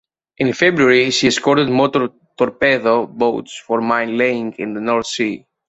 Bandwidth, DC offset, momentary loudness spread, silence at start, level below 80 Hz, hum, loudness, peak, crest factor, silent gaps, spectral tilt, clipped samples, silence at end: 8.2 kHz; under 0.1%; 10 LU; 0.4 s; -56 dBFS; none; -16 LUFS; 0 dBFS; 16 dB; none; -4.5 dB/octave; under 0.1%; 0.3 s